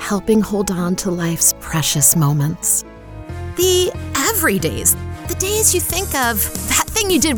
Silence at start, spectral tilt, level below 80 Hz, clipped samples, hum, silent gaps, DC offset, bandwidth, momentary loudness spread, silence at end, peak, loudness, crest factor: 0 s; -3.5 dB/octave; -36 dBFS; under 0.1%; none; none; under 0.1%; over 20 kHz; 8 LU; 0 s; -2 dBFS; -16 LUFS; 16 dB